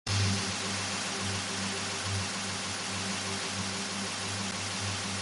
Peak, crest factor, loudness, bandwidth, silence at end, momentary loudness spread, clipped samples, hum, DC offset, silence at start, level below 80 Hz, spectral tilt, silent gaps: -18 dBFS; 16 dB; -32 LUFS; 11.5 kHz; 0 s; 3 LU; under 0.1%; none; under 0.1%; 0.05 s; -52 dBFS; -2.5 dB/octave; none